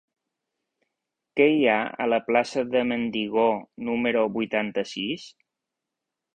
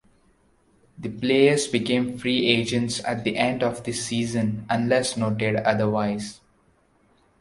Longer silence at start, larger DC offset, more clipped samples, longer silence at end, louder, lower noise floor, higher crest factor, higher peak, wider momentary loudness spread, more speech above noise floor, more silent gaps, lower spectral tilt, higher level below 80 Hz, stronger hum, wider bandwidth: first, 1.35 s vs 1 s; neither; neither; about the same, 1.05 s vs 1.05 s; about the same, -24 LUFS vs -23 LUFS; first, -85 dBFS vs -62 dBFS; about the same, 20 dB vs 22 dB; second, -6 dBFS vs -2 dBFS; about the same, 9 LU vs 9 LU; first, 61 dB vs 39 dB; neither; about the same, -5 dB/octave vs -4.5 dB/octave; second, -66 dBFS vs -58 dBFS; neither; second, 9.2 kHz vs 11.5 kHz